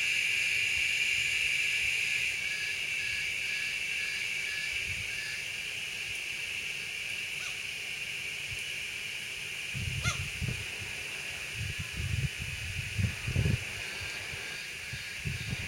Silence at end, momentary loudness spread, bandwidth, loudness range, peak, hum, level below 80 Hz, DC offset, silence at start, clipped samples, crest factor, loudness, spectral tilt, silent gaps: 0 s; 9 LU; 16.5 kHz; 6 LU; -16 dBFS; none; -52 dBFS; under 0.1%; 0 s; under 0.1%; 18 dB; -32 LUFS; -2 dB/octave; none